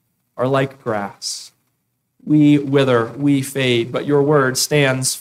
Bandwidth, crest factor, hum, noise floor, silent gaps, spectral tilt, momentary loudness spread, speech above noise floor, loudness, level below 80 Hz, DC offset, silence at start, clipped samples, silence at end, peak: 16 kHz; 14 dB; none; -70 dBFS; none; -5 dB/octave; 11 LU; 54 dB; -17 LUFS; -60 dBFS; under 0.1%; 0.35 s; under 0.1%; 0 s; -4 dBFS